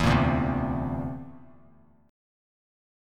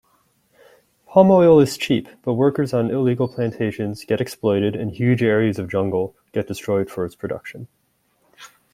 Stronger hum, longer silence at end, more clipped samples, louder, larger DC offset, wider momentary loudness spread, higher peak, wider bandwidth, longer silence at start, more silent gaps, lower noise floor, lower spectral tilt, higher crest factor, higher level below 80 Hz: neither; first, 1.7 s vs 0.25 s; neither; second, -27 LUFS vs -19 LUFS; neither; first, 17 LU vs 14 LU; second, -10 dBFS vs -2 dBFS; second, 14 kHz vs 15.5 kHz; second, 0 s vs 1.1 s; neither; second, -58 dBFS vs -65 dBFS; about the same, -7 dB/octave vs -7 dB/octave; about the same, 20 dB vs 18 dB; first, -40 dBFS vs -56 dBFS